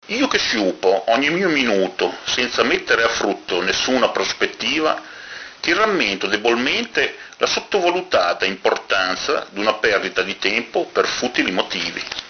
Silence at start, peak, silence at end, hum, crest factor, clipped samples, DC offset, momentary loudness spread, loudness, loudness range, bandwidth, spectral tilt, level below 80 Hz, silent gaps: 0.05 s; 0 dBFS; 0 s; none; 20 dB; under 0.1%; under 0.1%; 5 LU; -19 LUFS; 2 LU; 6.6 kHz; -2.5 dB/octave; -54 dBFS; none